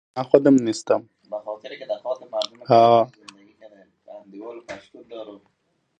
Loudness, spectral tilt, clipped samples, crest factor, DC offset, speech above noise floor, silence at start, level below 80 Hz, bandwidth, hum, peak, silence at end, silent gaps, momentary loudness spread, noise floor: -20 LUFS; -6 dB/octave; under 0.1%; 22 dB; under 0.1%; 51 dB; 0.15 s; -70 dBFS; 9.4 kHz; none; 0 dBFS; 0.65 s; none; 23 LU; -70 dBFS